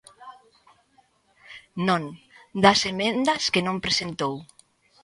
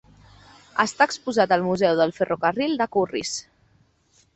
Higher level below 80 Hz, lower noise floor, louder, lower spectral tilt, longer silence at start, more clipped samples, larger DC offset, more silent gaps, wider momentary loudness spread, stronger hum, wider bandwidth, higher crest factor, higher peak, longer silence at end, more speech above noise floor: about the same, -60 dBFS vs -60 dBFS; about the same, -63 dBFS vs -62 dBFS; about the same, -23 LUFS vs -22 LUFS; about the same, -4 dB/octave vs -4 dB/octave; second, 0.2 s vs 0.75 s; neither; neither; neither; first, 20 LU vs 8 LU; neither; first, 11.5 kHz vs 8.4 kHz; about the same, 24 dB vs 20 dB; about the same, -2 dBFS vs -4 dBFS; second, 0.6 s vs 0.95 s; about the same, 40 dB vs 40 dB